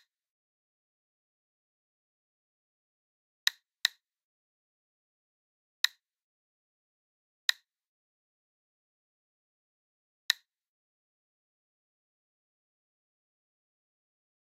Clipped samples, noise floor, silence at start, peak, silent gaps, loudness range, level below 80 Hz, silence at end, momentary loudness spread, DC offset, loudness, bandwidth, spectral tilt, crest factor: under 0.1%; under -90 dBFS; 3.85 s; -6 dBFS; 4.23-5.84 s, 6.22-7.49 s, 7.87-10.29 s; 5 LU; under -90 dBFS; 4.2 s; 0 LU; under 0.1%; -32 LUFS; 13 kHz; 8 dB/octave; 36 dB